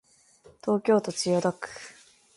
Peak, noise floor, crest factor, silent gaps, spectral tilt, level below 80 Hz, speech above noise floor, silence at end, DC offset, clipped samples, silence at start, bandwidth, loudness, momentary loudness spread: -10 dBFS; -57 dBFS; 18 dB; none; -5 dB/octave; -70 dBFS; 31 dB; 0.45 s; under 0.1%; under 0.1%; 0.65 s; 11.5 kHz; -26 LUFS; 18 LU